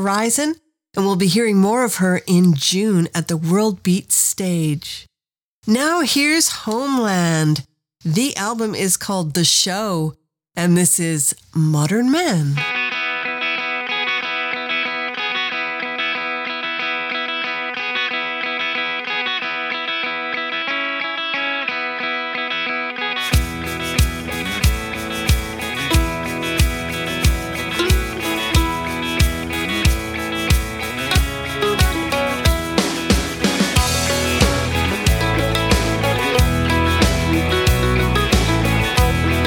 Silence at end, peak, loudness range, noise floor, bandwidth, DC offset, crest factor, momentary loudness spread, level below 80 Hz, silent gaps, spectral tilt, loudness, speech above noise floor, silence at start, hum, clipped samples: 0 s; -2 dBFS; 4 LU; under -90 dBFS; 19.5 kHz; under 0.1%; 16 dB; 7 LU; -28 dBFS; 5.43-5.62 s; -4 dB/octave; -18 LUFS; over 73 dB; 0 s; none; under 0.1%